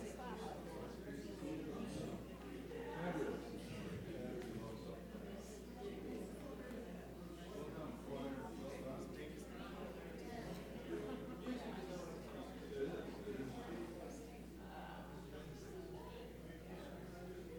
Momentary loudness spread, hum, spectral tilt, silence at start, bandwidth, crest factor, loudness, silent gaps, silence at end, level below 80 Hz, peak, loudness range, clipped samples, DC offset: 7 LU; none; -6 dB/octave; 0 s; over 20 kHz; 18 dB; -50 LUFS; none; 0 s; -60 dBFS; -30 dBFS; 3 LU; under 0.1%; under 0.1%